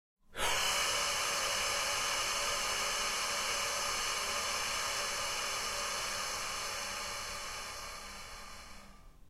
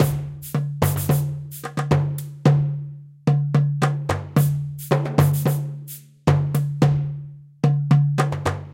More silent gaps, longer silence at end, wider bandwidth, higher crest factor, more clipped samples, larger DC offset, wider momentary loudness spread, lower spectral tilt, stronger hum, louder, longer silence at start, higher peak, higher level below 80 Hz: neither; about the same, 0 s vs 0 s; about the same, 16 kHz vs 16.5 kHz; about the same, 16 dB vs 18 dB; neither; neither; about the same, 13 LU vs 11 LU; second, 0.5 dB/octave vs -7 dB/octave; neither; second, -33 LUFS vs -22 LUFS; first, 0.3 s vs 0 s; second, -20 dBFS vs -2 dBFS; second, -56 dBFS vs -46 dBFS